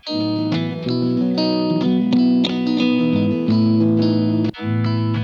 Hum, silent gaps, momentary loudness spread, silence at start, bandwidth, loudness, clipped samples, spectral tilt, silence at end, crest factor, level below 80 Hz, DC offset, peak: none; none; 6 LU; 0.05 s; 7 kHz; -18 LUFS; under 0.1%; -8 dB/octave; 0 s; 12 dB; -58 dBFS; under 0.1%; -6 dBFS